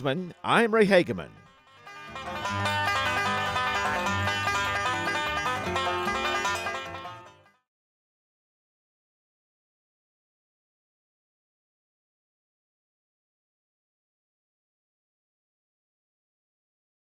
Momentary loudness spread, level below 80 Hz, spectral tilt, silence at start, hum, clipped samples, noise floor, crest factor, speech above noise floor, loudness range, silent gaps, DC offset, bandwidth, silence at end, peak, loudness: 17 LU; -58 dBFS; -4 dB/octave; 0 s; none; under 0.1%; -53 dBFS; 24 dB; 29 dB; 8 LU; none; under 0.1%; 16.5 kHz; 9.9 s; -6 dBFS; -26 LUFS